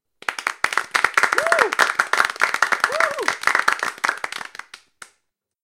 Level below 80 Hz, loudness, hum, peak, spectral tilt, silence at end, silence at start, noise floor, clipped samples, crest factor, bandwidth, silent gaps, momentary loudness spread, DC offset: -68 dBFS; -19 LUFS; none; 0 dBFS; 0 dB/octave; 0.85 s; 0.3 s; -73 dBFS; under 0.1%; 22 dB; 17 kHz; none; 12 LU; under 0.1%